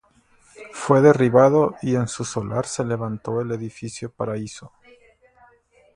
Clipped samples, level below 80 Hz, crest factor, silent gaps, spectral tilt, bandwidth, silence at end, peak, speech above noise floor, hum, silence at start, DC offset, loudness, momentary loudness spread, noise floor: under 0.1%; -58 dBFS; 22 dB; none; -6.5 dB/octave; 11.5 kHz; 1.3 s; 0 dBFS; 37 dB; none; 0.6 s; under 0.1%; -20 LUFS; 18 LU; -58 dBFS